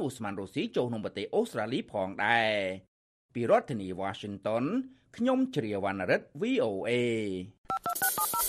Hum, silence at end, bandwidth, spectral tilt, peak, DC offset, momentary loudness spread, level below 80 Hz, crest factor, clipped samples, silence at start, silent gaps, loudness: none; 0 s; 15 kHz; -4 dB/octave; -10 dBFS; under 0.1%; 9 LU; -70 dBFS; 20 dB; under 0.1%; 0 s; 2.88-3.29 s, 7.58-7.64 s; -31 LUFS